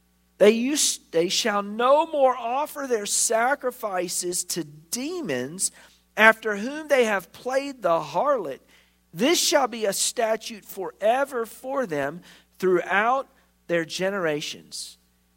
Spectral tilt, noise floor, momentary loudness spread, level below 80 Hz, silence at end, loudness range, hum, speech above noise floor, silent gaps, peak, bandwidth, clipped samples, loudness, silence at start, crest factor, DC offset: -2.5 dB/octave; -58 dBFS; 12 LU; -68 dBFS; 0.45 s; 4 LU; none; 34 dB; none; 0 dBFS; 16.5 kHz; under 0.1%; -23 LUFS; 0.4 s; 24 dB; under 0.1%